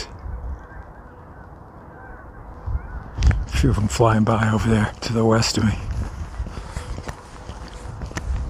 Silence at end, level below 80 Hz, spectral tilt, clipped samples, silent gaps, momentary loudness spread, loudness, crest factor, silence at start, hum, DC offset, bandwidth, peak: 0 s; -30 dBFS; -6 dB/octave; under 0.1%; none; 24 LU; -22 LUFS; 20 dB; 0 s; none; under 0.1%; 15 kHz; -2 dBFS